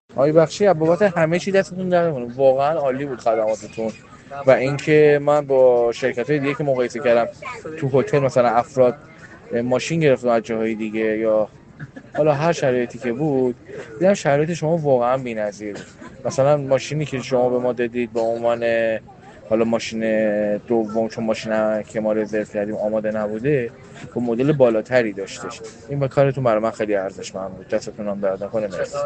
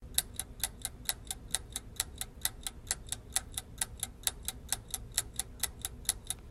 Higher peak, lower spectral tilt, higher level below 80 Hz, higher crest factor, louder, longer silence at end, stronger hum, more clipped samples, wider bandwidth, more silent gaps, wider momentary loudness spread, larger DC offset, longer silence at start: first, 0 dBFS vs -8 dBFS; first, -6.5 dB/octave vs -0.5 dB/octave; second, -58 dBFS vs -50 dBFS; second, 20 dB vs 32 dB; first, -20 LUFS vs -37 LUFS; about the same, 0 s vs 0 s; neither; neither; second, 8.8 kHz vs 16 kHz; neither; first, 12 LU vs 5 LU; neither; about the same, 0.1 s vs 0 s